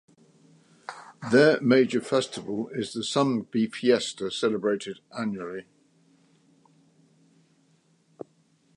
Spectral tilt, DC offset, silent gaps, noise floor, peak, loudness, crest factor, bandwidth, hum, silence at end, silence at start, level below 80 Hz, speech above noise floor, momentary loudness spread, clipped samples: -5 dB/octave; under 0.1%; none; -65 dBFS; -6 dBFS; -25 LUFS; 22 dB; 11 kHz; none; 3.15 s; 0.9 s; -72 dBFS; 40 dB; 23 LU; under 0.1%